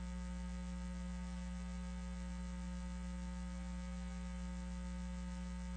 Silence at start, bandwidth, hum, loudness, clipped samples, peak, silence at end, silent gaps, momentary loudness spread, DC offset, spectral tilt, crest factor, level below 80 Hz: 0 s; 9 kHz; none; -46 LUFS; under 0.1%; -36 dBFS; 0 s; none; 0 LU; under 0.1%; -6 dB/octave; 8 dB; -46 dBFS